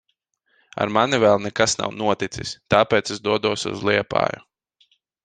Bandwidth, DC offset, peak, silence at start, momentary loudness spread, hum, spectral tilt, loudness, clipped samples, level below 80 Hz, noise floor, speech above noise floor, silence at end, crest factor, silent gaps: 9.8 kHz; under 0.1%; 0 dBFS; 0.75 s; 9 LU; none; -4 dB/octave; -21 LUFS; under 0.1%; -54 dBFS; -71 dBFS; 50 dB; 0.85 s; 22 dB; none